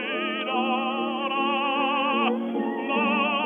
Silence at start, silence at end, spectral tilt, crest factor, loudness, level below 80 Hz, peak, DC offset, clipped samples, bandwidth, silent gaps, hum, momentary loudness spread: 0 s; 0 s; -6.5 dB/octave; 16 dB; -25 LUFS; under -90 dBFS; -10 dBFS; under 0.1%; under 0.1%; 3.9 kHz; none; none; 5 LU